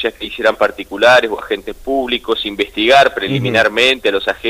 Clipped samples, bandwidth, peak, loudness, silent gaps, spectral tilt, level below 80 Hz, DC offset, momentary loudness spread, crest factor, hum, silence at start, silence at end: under 0.1%; 16 kHz; -2 dBFS; -14 LUFS; none; -4 dB/octave; -44 dBFS; under 0.1%; 10 LU; 14 dB; none; 0 s; 0 s